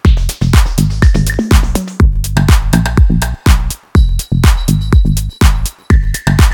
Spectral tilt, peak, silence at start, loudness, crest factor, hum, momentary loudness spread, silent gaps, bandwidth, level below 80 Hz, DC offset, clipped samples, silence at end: -5.5 dB/octave; 0 dBFS; 0.05 s; -12 LUFS; 10 dB; none; 3 LU; none; 19 kHz; -12 dBFS; under 0.1%; 0.5%; 0 s